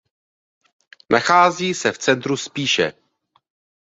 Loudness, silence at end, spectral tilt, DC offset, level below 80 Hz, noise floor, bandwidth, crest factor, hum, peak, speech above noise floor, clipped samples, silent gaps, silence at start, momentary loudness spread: -18 LUFS; 0.9 s; -3.5 dB/octave; under 0.1%; -62 dBFS; -65 dBFS; 8 kHz; 20 dB; none; -2 dBFS; 47 dB; under 0.1%; none; 1.1 s; 8 LU